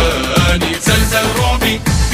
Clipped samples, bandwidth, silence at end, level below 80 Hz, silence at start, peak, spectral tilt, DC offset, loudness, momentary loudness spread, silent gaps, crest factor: under 0.1%; 16 kHz; 0 s; -20 dBFS; 0 s; 0 dBFS; -4 dB/octave; under 0.1%; -13 LUFS; 2 LU; none; 14 dB